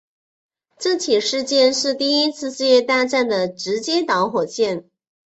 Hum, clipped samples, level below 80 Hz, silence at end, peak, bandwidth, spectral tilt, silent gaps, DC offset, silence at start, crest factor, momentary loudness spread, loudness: none; under 0.1%; -66 dBFS; 0.55 s; -4 dBFS; 8.2 kHz; -2.5 dB/octave; none; under 0.1%; 0.8 s; 16 dB; 7 LU; -19 LUFS